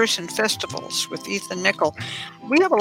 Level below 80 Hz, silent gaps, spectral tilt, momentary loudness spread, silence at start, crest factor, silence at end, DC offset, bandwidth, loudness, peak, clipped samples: -66 dBFS; none; -2.5 dB/octave; 10 LU; 0 s; 22 dB; 0 s; under 0.1%; 17 kHz; -23 LUFS; -2 dBFS; under 0.1%